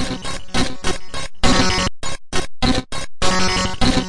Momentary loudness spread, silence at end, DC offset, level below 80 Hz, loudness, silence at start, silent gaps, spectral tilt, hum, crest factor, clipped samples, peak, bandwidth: 11 LU; 0 s; under 0.1%; -28 dBFS; -20 LUFS; 0 s; none; -3.5 dB/octave; none; 14 dB; under 0.1%; -2 dBFS; 11.5 kHz